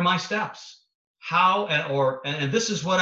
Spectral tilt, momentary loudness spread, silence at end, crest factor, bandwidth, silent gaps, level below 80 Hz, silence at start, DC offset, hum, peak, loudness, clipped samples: -4 dB/octave; 12 LU; 0 s; 18 dB; 8.2 kHz; 0.95-1.14 s; -66 dBFS; 0 s; under 0.1%; none; -8 dBFS; -24 LUFS; under 0.1%